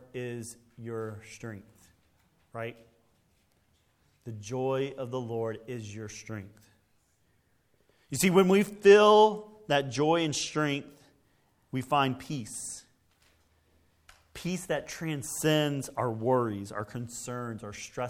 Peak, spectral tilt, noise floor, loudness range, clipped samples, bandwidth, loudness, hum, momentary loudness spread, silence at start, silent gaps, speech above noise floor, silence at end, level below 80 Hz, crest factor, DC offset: -8 dBFS; -5 dB/octave; -70 dBFS; 18 LU; under 0.1%; 16 kHz; -28 LUFS; none; 21 LU; 0.15 s; none; 41 dB; 0 s; -66 dBFS; 22 dB; under 0.1%